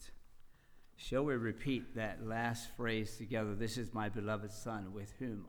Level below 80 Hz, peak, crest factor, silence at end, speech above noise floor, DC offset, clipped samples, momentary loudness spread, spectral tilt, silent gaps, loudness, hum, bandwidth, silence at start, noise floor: -56 dBFS; -24 dBFS; 16 dB; 0 s; 21 dB; under 0.1%; under 0.1%; 7 LU; -5.5 dB/octave; none; -40 LUFS; none; over 20 kHz; 0 s; -60 dBFS